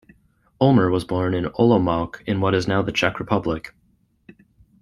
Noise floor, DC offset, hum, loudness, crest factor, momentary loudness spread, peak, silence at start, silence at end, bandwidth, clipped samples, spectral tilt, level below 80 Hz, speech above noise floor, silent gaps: -62 dBFS; under 0.1%; none; -21 LUFS; 20 dB; 9 LU; -2 dBFS; 0.6 s; 1.15 s; 12 kHz; under 0.1%; -7 dB/octave; -48 dBFS; 43 dB; none